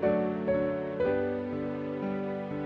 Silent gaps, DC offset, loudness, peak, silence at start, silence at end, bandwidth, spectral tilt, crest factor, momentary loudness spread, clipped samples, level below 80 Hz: none; under 0.1%; -31 LUFS; -16 dBFS; 0 s; 0 s; 5.6 kHz; -9.5 dB/octave; 14 dB; 5 LU; under 0.1%; -58 dBFS